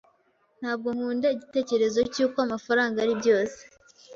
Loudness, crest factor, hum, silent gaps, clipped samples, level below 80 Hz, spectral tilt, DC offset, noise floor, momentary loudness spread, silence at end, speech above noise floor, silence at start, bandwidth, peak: -26 LUFS; 16 dB; none; none; under 0.1%; -64 dBFS; -4 dB/octave; under 0.1%; -66 dBFS; 7 LU; 0 s; 41 dB; 0.6 s; 7.6 kHz; -10 dBFS